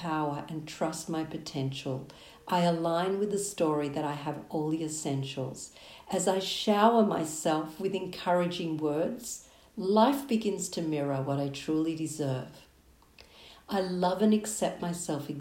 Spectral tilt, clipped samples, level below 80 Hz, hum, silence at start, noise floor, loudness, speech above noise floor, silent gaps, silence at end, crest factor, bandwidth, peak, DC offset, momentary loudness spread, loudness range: -5 dB/octave; under 0.1%; -66 dBFS; none; 0 s; -60 dBFS; -30 LUFS; 30 dB; none; 0 s; 22 dB; 16 kHz; -10 dBFS; under 0.1%; 12 LU; 4 LU